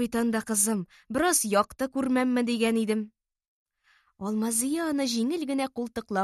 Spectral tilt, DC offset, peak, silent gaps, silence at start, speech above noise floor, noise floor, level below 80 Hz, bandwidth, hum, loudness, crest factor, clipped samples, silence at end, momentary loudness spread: -3.5 dB/octave; under 0.1%; -10 dBFS; 3.48-3.66 s; 0 s; 40 dB; -66 dBFS; -62 dBFS; 13 kHz; none; -27 LUFS; 18 dB; under 0.1%; 0 s; 9 LU